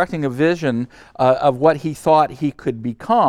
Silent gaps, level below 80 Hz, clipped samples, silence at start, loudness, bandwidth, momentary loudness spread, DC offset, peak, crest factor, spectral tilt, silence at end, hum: none; -52 dBFS; under 0.1%; 0 s; -18 LUFS; 14.5 kHz; 9 LU; under 0.1%; -2 dBFS; 16 dB; -7 dB/octave; 0 s; none